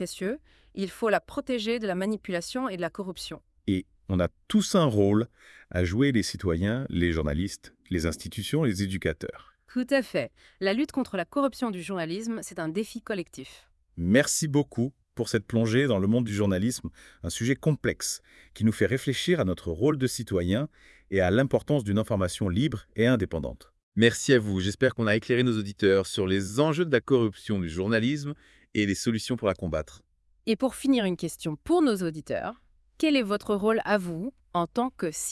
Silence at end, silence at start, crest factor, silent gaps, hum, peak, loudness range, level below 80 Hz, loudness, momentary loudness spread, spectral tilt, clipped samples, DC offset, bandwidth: 0 s; 0 s; 20 dB; 23.83-23.92 s; none; -6 dBFS; 5 LU; -52 dBFS; -27 LUFS; 11 LU; -5.5 dB/octave; under 0.1%; under 0.1%; 12 kHz